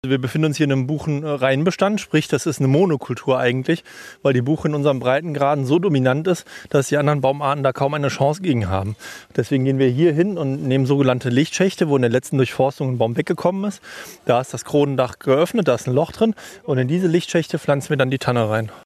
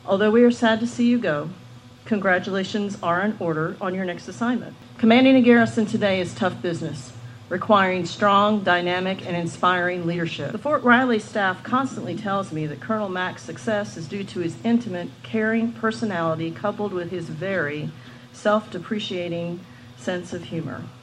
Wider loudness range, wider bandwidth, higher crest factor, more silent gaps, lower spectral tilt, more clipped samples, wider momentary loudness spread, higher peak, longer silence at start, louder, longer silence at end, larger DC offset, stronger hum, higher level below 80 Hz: second, 2 LU vs 7 LU; first, 14 kHz vs 10.5 kHz; about the same, 16 dB vs 20 dB; neither; about the same, -6.5 dB/octave vs -6 dB/octave; neither; second, 6 LU vs 14 LU; about the same, -2 dBFS vs -4 dBFS; about the same, 0.05 s vs 0.05 s; first, -19 LUFS vs -22 LUFS; about the same, 0.05 s vs 0.05 s; neither; neither; first, -56 dBFS vs -64 dBFS